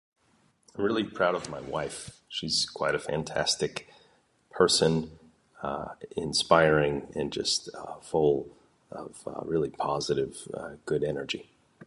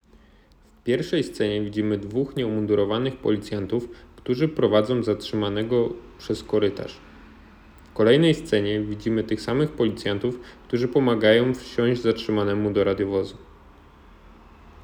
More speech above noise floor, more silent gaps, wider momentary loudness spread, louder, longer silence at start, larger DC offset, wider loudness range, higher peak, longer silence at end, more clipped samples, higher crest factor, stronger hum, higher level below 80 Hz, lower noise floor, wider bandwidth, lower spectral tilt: first, 38 dB vs 32 dB; neither; first, 18 LU vs 10 LU; second, -28 LUFS vs -23 LUFS; about the same, 0.75 s vs 0.85 s; neither; about the same, 5 LU vs 3 LU; about the same, -6 dBFS vs -4 dBFS; second, 0 s vs 0.15 s; neither; about the same, 24 dB vs 20 dB; neither; second, -56 dBFS vs -50 dBFS; first, -67 dBFS vs -54 dBFS; second, 11.5 kHz vs 14.5 kHz; second, -3.5 dB/octave vs -7 dB/octave